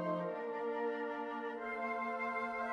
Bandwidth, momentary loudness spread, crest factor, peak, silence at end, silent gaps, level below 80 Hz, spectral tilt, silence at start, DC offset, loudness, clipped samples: 9.6 kHz; 3 LU; 14 dB; -26 dBFS; 0 s; none; -76 dBFS; -7 dB/octave; 0 s; under 0.1%; -39 LUFS; under 0.1%